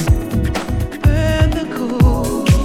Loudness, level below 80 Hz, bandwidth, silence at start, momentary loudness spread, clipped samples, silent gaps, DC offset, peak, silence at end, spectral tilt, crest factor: -17 LUFS; -20 dBFS; 16 kHz; 0 s; 6 LU; under 0.1%; none; under 0.1%; 0 dBFS; 0 s; -6.5 dB/octave; 14 dB